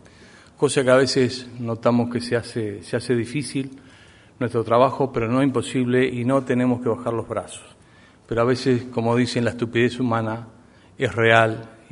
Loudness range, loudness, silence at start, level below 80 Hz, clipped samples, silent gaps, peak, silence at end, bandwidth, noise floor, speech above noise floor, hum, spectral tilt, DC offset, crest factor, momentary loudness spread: 3 LU; -21 LUFS; 0.6 s; -54 dBFS; under 0.1%; none; 0 dBFS; 0.2 s; 11 kHz; -51 dBFS; 30 dB; none; -6 dB/octave; under 0.1%; 22 dB; 12 LU